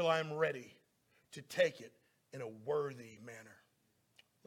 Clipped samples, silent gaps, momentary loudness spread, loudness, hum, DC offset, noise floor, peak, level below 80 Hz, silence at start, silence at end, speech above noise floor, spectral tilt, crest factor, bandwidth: under 0.1%; none; 21 LU; -38 LUFS; none; under 0.1%; -77 dBFS; -20 dBFS; -86 dBFS; 0 s; 0.95 s; 39 dB; -4.5 dB/octave; 22 dB; 16.5 kHz